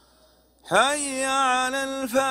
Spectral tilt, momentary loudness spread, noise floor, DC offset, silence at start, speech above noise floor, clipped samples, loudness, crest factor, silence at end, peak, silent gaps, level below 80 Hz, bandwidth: -1.5 dB/octave; 5 LU; -58 dBFS; under 0.1%; 0.65 s; 36 dB; under 0.1%; -23 LUFS; 20 dB; 0 s; -4 dBFS; none; -60 dBFS; 16 kHz